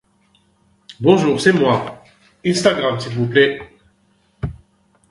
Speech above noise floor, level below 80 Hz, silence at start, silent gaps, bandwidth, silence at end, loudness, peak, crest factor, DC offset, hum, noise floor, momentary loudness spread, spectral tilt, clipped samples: 44 dB; -46 dBFS; 0.9 s; none; 11.5 kHz; 0.6 s; -16 LUFS; 0 dBFS; 18 dB; under 0.1%; none; -59 dBFS; 16 LU; -5.5 dB/octave; under 0.1%